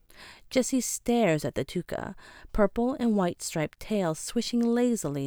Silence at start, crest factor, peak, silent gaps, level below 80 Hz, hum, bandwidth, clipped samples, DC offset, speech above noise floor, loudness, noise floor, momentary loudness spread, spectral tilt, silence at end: 0.2 s; 18 dB; -10 dBFS; none; -46 dBFS; none; over 20 kHz; under 0.1%; under 0.1%; 23 dB; -28 LUFS; -51 dBFS; 10 LU; -5 dB/octave; 0 s